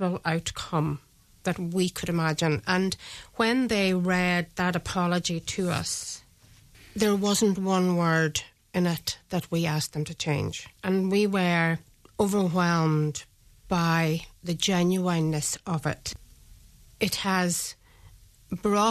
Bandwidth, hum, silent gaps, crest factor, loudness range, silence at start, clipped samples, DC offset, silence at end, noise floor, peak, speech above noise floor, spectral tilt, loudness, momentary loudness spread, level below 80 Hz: 14 kHz; none; none; 18 dB; 3 LU; 0 s; under 0.1%; under 0.1%; 0 s; -56 dBFS; -10 dBFS; 30 dB; -5 dB/octave; -26 LUFS; 10 LU; -54 dBFS